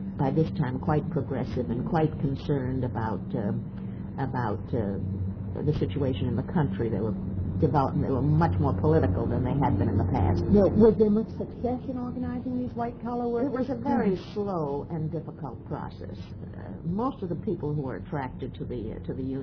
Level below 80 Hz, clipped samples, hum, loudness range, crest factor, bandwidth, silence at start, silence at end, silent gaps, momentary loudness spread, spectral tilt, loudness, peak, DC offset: -44 dBFS; under 0.1%; none; 9 LU; 20 dB; 5.4 kHz; 0 s; 0 s; none; 12 LU; -10.5 dB/octave; -28 LUFS; -8 dBFS; under 0.1%